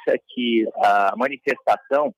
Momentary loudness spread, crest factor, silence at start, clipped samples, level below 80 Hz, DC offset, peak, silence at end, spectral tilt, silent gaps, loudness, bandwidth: 6 LU; 12 dB; 0.05 s; under 0.1%; -74 dBFS; under 0.1%; -8 dBFS; 0.05 s; -5 dB/octave; none; -21 LUFS; 15 kHz